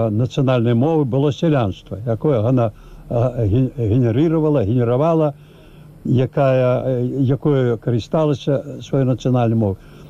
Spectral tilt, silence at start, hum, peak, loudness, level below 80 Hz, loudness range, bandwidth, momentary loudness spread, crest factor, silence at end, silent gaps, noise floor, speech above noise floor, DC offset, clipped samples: -9 dB/octave; 0 s; none; -8 dBFS; -18 LUFS; -44 dBFS; 1 LU; 7.4 kHz; 6 LU; 10 dB; 0 s; none; -42 dBFS; 25 dB; 0.1%; under 0.1%